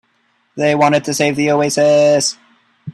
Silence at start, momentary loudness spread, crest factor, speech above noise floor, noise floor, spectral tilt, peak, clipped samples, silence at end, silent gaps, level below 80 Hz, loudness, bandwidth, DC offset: 0.55 s; 7 LU; 14 dB; 47 dB; -61 dBFS; -4 dB/octave; 0 dBFS; under 0.1%; 0 s; none; -58 dBFS; -14 LUFS; 13 kHz; under 0.1%